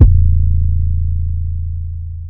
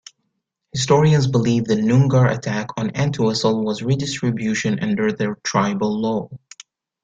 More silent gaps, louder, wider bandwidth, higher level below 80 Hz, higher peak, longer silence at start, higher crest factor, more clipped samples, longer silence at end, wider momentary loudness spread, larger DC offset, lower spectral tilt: neither; about the same, -17 LUFS vs -19 LUFS; second, 1.1 kHz vs 9 kHz; first, -14 dBFS vs -52 dBFS; about the same, 0 dBFS vs -2 dBFS; second, 0 s vs 0.75 s; about the same, 12 dB vs 16 dB; first, 0.9% vs under 0.1%; second, 0 s vs 0.65 s; about the same, 11 LU vs 9 LU; neither; first, -15.5 dB/octave vs -6 dB/octave